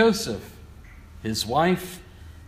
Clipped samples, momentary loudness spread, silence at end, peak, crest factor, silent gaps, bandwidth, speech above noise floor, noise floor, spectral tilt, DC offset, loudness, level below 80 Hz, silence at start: under 0.1%; 25 LU; 0.05 s; -6 dBFS; 20 dB; none; 15.5 kHz; 21 dB; -45 dBFS; -4.5 dB/octave; under 0.1%; -25 LUFS; -48 dBFS; 0 s